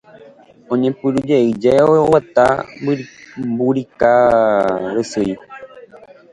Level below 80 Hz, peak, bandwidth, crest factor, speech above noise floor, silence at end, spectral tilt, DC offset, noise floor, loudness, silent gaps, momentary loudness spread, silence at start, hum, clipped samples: -50 dBFS; 0 dBFS; 11.5 kHz; 16 dB; 29 dB; 0.5 s; -7 dB/octave; under 0.1%; -44 dBFS; -15 LUFS; none; 12 LU; 0.7 s; none; under 0.1%